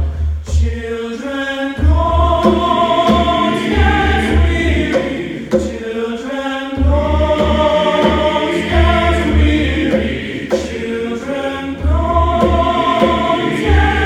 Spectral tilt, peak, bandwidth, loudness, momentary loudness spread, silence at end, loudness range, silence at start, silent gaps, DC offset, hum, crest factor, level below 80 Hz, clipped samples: -6.5 dB/octave; 0 dBFS; 9.8 kHz; -15 LUFS; 8 LU; 0 s; 3 LU; 0 s; none; under 0.1%; none; 14 dB; -20 dBFS; under 0.1%